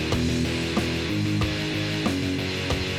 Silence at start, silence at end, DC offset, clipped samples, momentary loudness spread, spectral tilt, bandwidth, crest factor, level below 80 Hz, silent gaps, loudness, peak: 0 s; 0 s; under 0.1%; under 0.1%; 2 LU; -5 dB/octave; 16 kHz; 16 dB; -38 dBFS; none; -25 LUFS; -10 dBFS